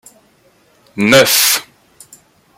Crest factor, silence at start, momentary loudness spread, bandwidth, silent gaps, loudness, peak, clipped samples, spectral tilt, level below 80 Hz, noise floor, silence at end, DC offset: 16 dB; 0.95 s; 11 LU; 17 kHz; none; -10 LUFS; 0 dBFS; under 0.1%; -2 dB/octave; -58 dBFS; -52 dBFS; 0.95 s; under 0.1%